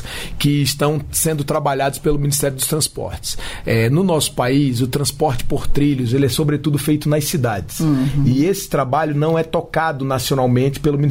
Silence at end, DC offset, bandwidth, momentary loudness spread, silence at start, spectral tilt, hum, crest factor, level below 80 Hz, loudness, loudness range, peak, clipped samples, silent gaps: 0 s; under 0.1%; 16.5 kHz; 4 LU; 0 s; -5 dB/octave; none; 12 dB; -32 dBFS; -18 LUFS; 1 LU; -4 dBFS; under 0.1%; none